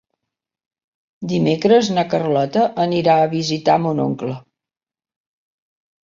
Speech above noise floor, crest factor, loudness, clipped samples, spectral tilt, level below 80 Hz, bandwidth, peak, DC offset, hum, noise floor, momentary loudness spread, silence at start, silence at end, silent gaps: 72 dB; 16 dB; -17 LUFS; under 0.1%; -6 dB/octave; -60 dBFS; 7.6 kHz; -2 dBFS; under 0.1%; none; -89 dBFS; 11 LU; 1.2 s; 1.65 s; none